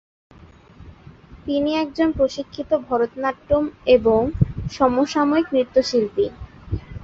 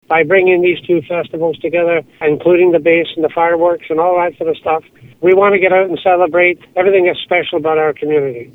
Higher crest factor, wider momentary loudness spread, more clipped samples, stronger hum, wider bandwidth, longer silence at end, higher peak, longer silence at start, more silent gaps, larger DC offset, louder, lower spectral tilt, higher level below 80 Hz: first, 18 dB vs 12 dB; first, 11 LU vs 7 LU; neither; neither; first, 7.8 kHz vs 4 kHz; about the same, 0 s vs 0.1 s; about the same, -2 dBFS vs 0 dBFS; first, 0.8 s vs 0.1 s; neither; neither; second, -21 LUFS vs -13 LUFS; second, -6.5 dB/octave vs -8 dB/octave; first, -40 dBFS vs -54 dBFS